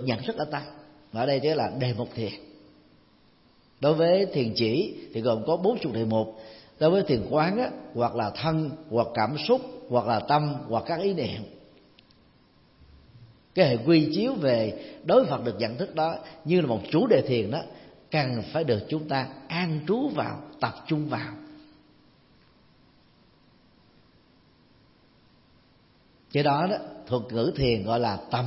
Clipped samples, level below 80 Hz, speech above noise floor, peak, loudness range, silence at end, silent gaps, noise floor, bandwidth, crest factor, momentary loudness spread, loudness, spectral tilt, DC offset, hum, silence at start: under 0.1%; -58 dBFS; 34 dB; -6 dBFS; 7 LU; 0 s; none; -60 dBFS; 6 kHz; 20 dB; 11 LU; -26 LUFS; -10 dB/octave; under 0.1%; none; 0 s